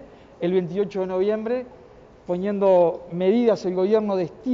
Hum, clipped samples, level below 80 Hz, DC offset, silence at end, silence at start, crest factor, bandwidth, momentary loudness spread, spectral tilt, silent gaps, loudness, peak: none; under 0.1%; -60 dBFS; under 0.1%; 0 s; 0 s; 14 dB; 7.2 kHz; 10 LU; -8 dB/octave; none; -22 LUFS; -8 dBFS